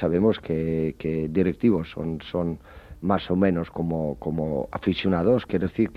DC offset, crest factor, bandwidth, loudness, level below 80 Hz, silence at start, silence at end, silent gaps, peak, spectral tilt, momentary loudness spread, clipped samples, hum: under 0.1%; 16 dB; 5.6 kHz; -25 LUFS; -46 dBFS; 0 s; 0 s; none; -8 dBFS; -9 dB/octave; 7 LU; under 0.1%; none